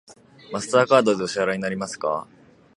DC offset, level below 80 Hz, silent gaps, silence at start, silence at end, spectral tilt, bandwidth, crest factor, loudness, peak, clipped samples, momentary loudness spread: under 0.1%; -64 dBFS; none; 0.1 s; 0.55 s; -4.5 dB/octave; 11.5 kHz; 22 dB; -22 LUFS; -2 dBFS; under 0.1%; 13 LU